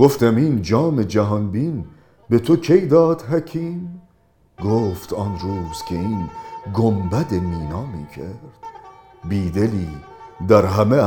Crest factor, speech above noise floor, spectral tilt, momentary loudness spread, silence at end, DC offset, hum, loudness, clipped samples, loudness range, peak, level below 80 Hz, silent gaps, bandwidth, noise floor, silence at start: 20 dB; 39 dB; -8 dB/octave; 18 LU; 0 s; under 0.1%; none; -19 LUFS; under 0.1%; 7 LU; 0 dBFS; -44 dBFS; none; 19.5 kHz; -57 dBFS; 0 s